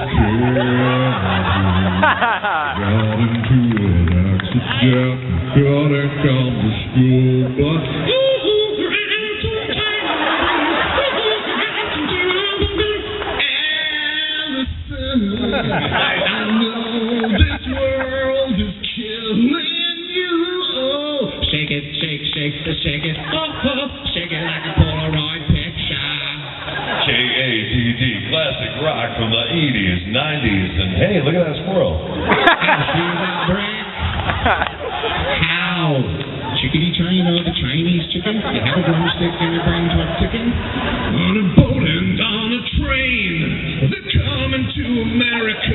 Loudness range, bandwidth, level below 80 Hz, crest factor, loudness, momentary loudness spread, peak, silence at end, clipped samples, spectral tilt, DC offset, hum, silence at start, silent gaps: 3 LU; 4.2 kHz; -32 dBFS; 18 dB; -17 LUFS; 6 LU; 0 dBFS; 0 s; under 0.1%; -4 dB/octave; under 0.1%; none; 0 s; none